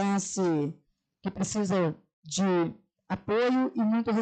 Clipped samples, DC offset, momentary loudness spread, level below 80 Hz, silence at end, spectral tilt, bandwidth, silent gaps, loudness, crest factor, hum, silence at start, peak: under 0.1%; under 0.1%; 11 LU; -66 dBFS; 0 s; -5.5 dB/octave; 9.2 kHz; 2.13-2.23 s; -29 LUFS; 12 dB; none; 0 s; -18 dBFS